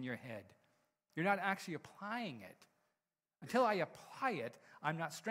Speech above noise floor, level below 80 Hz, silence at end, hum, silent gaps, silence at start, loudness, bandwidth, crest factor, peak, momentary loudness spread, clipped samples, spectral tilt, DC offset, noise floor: over 50 dB; -86 dBFS; 0 s; none; none; 0 s; -40 LUFS; 16 kHz; 22 dB; -20 dBFS; 16 LU; under 0.1%; -5 dB/octave; under 0.1%; under -90 dBFS